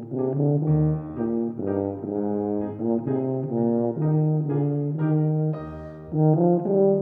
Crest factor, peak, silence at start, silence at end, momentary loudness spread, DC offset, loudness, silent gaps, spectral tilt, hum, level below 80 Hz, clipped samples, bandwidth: 16 dB; -8 dBFS; 0 s; 0 s; 7 LU; under 0.1%; -24 LUFS; none; -14 dB/octave; none; -52 dBFS; under 0.1%; 2.5 kHz